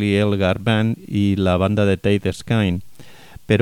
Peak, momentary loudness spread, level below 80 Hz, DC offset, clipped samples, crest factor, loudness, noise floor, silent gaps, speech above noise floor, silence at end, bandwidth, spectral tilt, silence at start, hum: -2 dBFS; 4 LU; -44 dBFS; under 0.1%; under 0.1%; 16 dB; -19 LUFS; -42 dBFS; none; 24 dB; 0 s; 13 kHz; -7 dB/octave; 0 s; none